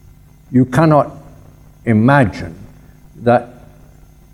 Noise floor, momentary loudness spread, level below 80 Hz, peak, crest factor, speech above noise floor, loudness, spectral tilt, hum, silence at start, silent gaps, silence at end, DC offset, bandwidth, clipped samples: -43 dBFS; 16 LU; -44 dBFS; 0 dBFS; 16 dB; 31 dB; -14 LUFS; -8.5 dB/octave; none; 0.5 s; none; 0.85 s; under 0.1%; 13 kHz; under 0.1%